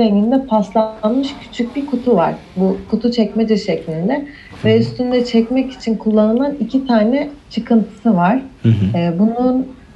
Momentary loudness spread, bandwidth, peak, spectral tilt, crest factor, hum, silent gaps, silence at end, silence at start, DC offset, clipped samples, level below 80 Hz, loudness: 6 LU; 8 kHz; -2 dBFS; -8 dB/octave; 14 dB; none; none; 0.2 s; 0 s; under 0.1%; under 0.1%; -46 dBFS; -16 LUFS